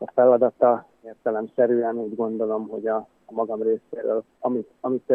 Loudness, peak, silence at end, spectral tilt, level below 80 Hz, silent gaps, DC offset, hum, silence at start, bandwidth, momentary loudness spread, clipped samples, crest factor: -24 LUFS; -4 dBFS; 0 s; -10.5 dB/octave; -76 dBFS; none; under 0.1%; none; 0 s; 3.4 kHz; 10 LU; under 0.1%; 18 dB